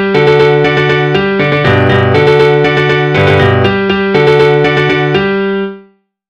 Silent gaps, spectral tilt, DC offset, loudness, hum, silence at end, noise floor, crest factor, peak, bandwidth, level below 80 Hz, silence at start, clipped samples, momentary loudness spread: none; -7 dB/octave; under 0.1%; -9 LUFS; none; 0.5 s; -44 dBFS; 8 dB; 0 dBFS; 8.8 kHz; -38 dBFS; 0 s; 0.5%; 4 LU